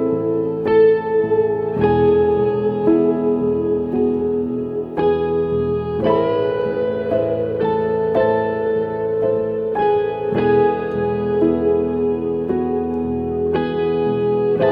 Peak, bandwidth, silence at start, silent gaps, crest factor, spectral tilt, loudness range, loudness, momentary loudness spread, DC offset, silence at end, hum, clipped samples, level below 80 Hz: -4 dBFS; 4.8 kHz; 0 s; none; 14 dB; -10 dB/octave; 3 LU; -18 LUFS; 5 LU; under 0.1%; 0 s; none; under 0.1%; -48 dBFS